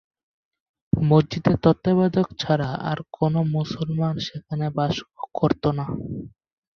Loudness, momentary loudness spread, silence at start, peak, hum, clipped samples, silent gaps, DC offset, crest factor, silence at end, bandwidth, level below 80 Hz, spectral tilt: -23 LUFS; 11 LU; 0.95 s; -4 dBFS; none; under 0.1%; none; under 0.1%; 20 dB; 0.45 s; 6.8 kHz; -48 dBFS; -8 dB/octave